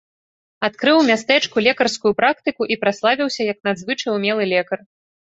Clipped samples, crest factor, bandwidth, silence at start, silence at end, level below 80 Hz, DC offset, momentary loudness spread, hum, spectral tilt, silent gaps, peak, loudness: under 0.1%; 18 dB; 8.2 kHz; 0.6 s; 0.55 s; -62 dBFS; under 0.1%; 8 LU; none; -4 dB/octave; none; -2 dBFS; -18 LUFS